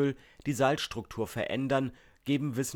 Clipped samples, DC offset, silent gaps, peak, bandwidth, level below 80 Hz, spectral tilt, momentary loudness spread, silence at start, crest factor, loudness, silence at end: under 0.1%; under 0.1%; none; -12 dBFS; 18 kHz; -60 dBFS; -5 dB/octave; 10 LU; 0 s; 20 dB; -32 LUFS; 0 s